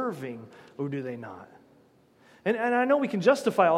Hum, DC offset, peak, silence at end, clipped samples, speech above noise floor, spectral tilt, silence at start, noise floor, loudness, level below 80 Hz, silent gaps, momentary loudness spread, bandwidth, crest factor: none; under 0.1%; -8 dBFS; 0 s; under 0.1%; 34 dB; -6 dB/octave; 0 s; -60 dBFS; -27 LUFS; -78 dBFS; none; 20 LU; 15 kHz; 20 dB